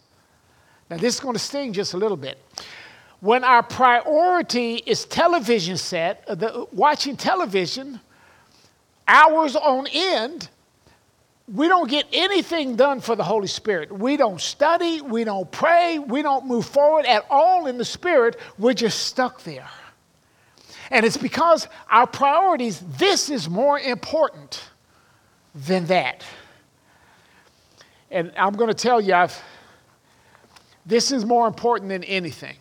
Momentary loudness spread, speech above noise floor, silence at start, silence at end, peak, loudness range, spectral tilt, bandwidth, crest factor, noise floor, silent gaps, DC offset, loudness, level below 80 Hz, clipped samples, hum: 12 LU; 41 dB; 0.9 s; 0.1 s; -2 dBFS; 6 LU; -3.5 dB/octave; 17 kHz; 20 dB; -61 dBFS; none; under 0.1%; -20 LUFS; -66 dBFS; under 0.1%; none